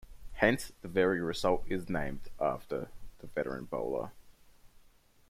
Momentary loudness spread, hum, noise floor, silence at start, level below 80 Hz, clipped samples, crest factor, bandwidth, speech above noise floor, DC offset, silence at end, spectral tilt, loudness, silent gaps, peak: 12 LU; none; -62 dBFS; 0 s; -50 dBFS; under 0.1%; 24 dB; 16 kHz; 29 dB; under 0.1%; 0.4 s; -5.5 dB/octave; -34 LUFS; none; -10 dBFS